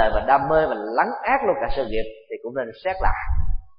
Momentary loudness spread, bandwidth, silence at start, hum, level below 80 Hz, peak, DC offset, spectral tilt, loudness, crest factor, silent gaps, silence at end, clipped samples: 11 LU; 5.2 kHz; 0 s; none; -30 dBFS; -4 dBFS; under 0.1%; -10.5 dB/octave; -23 LUFS; 18 dB; none; 0.1 s; under 0.1%